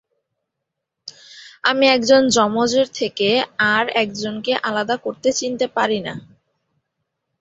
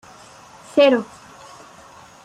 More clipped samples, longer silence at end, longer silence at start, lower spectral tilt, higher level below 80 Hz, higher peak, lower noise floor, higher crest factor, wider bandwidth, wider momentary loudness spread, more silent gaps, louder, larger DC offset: neither; about the same, 1.2 s vs 1.2 s; first, 1.05 s vs 0.75 s; about the same, -3 dB/octave vs -4 dB/octave; first, -60 dBFS vs -66 dBFS; about the same, -2 dBFS vs -4 dBFS; first, -80 dBFS vs -45 dBFS; about the same, 18 dB vs 18 dB; second, 8.2 kHz vs 11 kHz; second, 16 LU vs 27 LU; neither; about the same, -18 LUFS vs -17 LUFS; neither